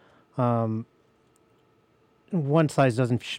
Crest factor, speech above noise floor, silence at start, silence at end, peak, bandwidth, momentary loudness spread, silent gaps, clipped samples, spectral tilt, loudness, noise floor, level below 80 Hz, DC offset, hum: 18 dB; 40 dB; 0.35 s; 0 s; -8 dBFS; 13 kHz; 13 LU; none; under 0.1%; -7 dB/octave; -25 LUFS; -63 dBFS; -68 dBFS; under 0.1%; none